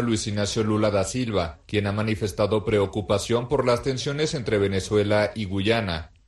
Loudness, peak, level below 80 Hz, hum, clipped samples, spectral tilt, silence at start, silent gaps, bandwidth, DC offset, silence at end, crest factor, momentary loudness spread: -24 LUFS; -8 dBFS; -46 dBFS; none; under 0.1%; -5.5 dB/octave; 0 s; none; 12 kHz; under 0.1%; 0.2 s; 16 dB; 4 LU